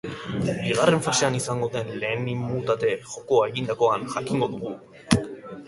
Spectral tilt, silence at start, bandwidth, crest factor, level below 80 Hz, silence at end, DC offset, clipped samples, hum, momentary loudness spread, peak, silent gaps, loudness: -4.5 dB/octave; 0.05 s; 11.5 kHz; 24 dB; -54 dBFS; 0 s; under 0.1%; under 0.1%; none; 10 LU; 0 dBFS; none; -25 LUFS